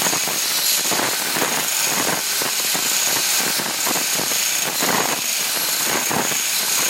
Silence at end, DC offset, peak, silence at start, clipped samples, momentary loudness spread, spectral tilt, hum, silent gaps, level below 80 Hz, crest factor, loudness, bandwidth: 0 s; under 0.1%; -4 dBFS; 0 s; under 0.1%; 2 LU; 0 dB/octave; none; none; -64 dBFS; 16 dB; -17 LUFS; 17 kHz